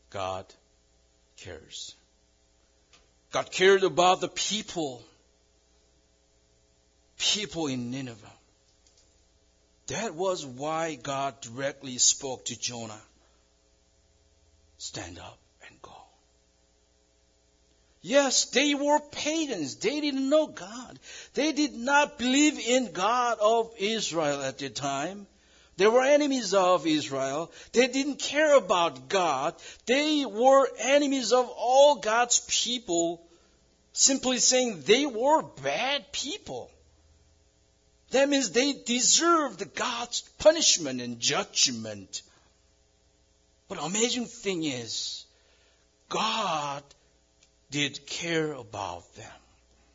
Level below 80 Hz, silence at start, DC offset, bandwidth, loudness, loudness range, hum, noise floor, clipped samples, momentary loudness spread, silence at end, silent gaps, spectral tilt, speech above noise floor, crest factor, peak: -66 dBFS; 0.15 s; under 0.1%; 7.8 kHz; -26 LUFS; 11 LU; none; -66 dBFS; under 0.1%; 17 LU; 0.6 s; none; -2 dB/octave; 39 dB; 22 dB; -8 dBFS